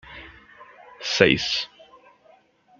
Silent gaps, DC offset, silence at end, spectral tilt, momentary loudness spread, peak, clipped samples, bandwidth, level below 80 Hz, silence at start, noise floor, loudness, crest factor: none; under 0.1%; 1.15 s; -3.5 dB/octave; 24 LU; -2 dBFS; under 0.1%; 7.6 kHz; -54 dBFS; 0.05 s; -57 dBFS; -21 LUFS; 26 dB